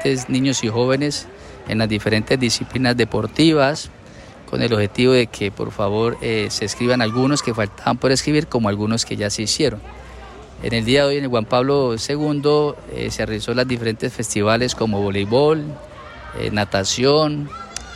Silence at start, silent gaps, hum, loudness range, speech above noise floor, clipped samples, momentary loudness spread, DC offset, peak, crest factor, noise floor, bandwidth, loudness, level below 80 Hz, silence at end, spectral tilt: 0 s; none; none; 2 LU; 21 dB; under 0.1%; 12 LU; under 0.1%; -4 dBFS; 14 dB; -40 dBFS; 15 kHz; -19 LUFS; -44 dBFS; 0 s; -4.5 dB/octave